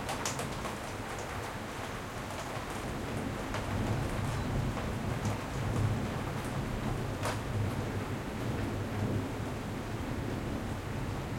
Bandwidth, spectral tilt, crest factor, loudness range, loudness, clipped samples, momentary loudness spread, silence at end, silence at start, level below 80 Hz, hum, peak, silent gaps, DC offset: 16.5 kHz; -5.5 dB/octave; 16 dB; 3 LU; -36 LUFS; under 0.1%; 5 LU; 0 s; 0 s; -46 dBFS; none; -18 dBFS; none; under 0.1%